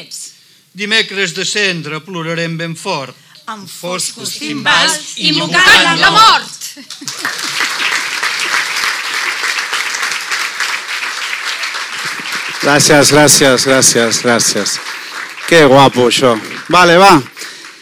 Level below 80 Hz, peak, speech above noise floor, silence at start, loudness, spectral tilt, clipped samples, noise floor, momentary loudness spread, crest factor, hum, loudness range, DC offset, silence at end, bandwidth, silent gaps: -48 dBFS; 0 dBFS; 30 dB; 0 s; -11 LUFS; -2.5 dB/octave; under 0.1%; -41 dBFS; 17 LU; 12 dB; none; 7 LU; under 0.1%; 0.1 s; over 20 kHz; none